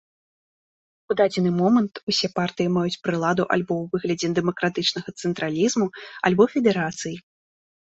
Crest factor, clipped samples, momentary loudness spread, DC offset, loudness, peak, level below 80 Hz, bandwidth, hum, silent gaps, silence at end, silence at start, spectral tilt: 20 dB; under 0.1%; 9 LU; under 0.1%; -23 LUFS; -4 dBFS; -62 dBFS; 8.2 kHz; none; 2.03-2.07 s; 0.75 s; 1.1 s; -5 dB/octave